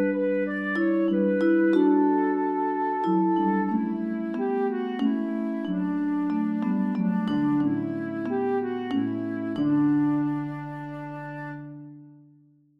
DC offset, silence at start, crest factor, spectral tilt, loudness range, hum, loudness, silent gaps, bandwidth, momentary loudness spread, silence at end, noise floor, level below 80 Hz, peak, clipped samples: under 0.1%; 0 s; 16 dB; -9.5 dB/octave; 4 LU; none; -25 LUFS; none; 5.4 kHz; 14 LU; 0.65 s; -58 dBFS; -74 dBFS; -10 dBFS; under 0.1%